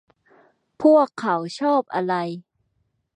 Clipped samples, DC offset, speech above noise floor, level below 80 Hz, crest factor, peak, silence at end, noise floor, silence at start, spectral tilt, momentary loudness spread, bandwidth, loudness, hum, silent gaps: under 0.1%; under 0.1%; 51 dB; -74 dBFS; 18 dB; -4 dBFS; 0.75 s; -71 dBFS; 0.8 s; -6.5 dB/octave; 11 LU; 10 kHz; -21 LUFS; none; none